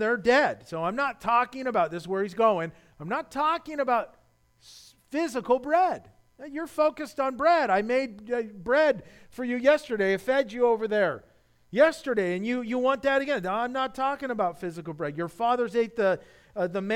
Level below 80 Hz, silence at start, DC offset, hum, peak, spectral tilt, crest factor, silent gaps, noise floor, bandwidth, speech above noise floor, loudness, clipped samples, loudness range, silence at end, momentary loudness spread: -62 dBFS; 0 s; under 0.1%; none; -8 dBFS; -5.5 dB/octave; 18 dB; none; -59 dBFS; 16 kHz; 33 dB; -26 LUFS; under 0.1%; 4 LU; 0 s; 11 LU